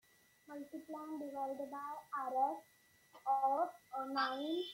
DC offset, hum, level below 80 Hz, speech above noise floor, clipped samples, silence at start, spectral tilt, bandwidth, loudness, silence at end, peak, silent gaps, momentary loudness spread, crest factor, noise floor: under 0.1%; none; -90 dBFS; 26 dB; under 0.1%; 0.5 s; -3.5 dB/octave; 16.5 kHz; -40 LUFS; 0 s; -24 dBFS; none; 14 LU; 18 dB; -66 dBFS